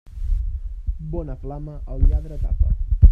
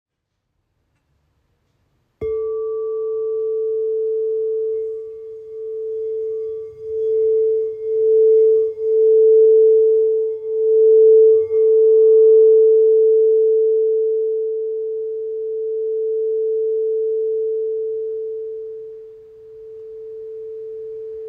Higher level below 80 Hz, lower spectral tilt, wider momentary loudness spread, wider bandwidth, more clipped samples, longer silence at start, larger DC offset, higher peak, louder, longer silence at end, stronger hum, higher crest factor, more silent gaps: first, -20 dBFS vs -62 dBFS; first, -11.5 dB/octave vs -9 dB/octave; second, 11 LU vs 20 LU; first, 1.5 kHz vs 1.2 kHz; neither; second, 0.05 s vs 2.2 s; neither; first, 0 dBFS vs -6 dBFS; second, -26 LUFS vs -16 LUFS; about the same, 0 s vs 0 s; neither; first, 18 dB vs 12 dB; neither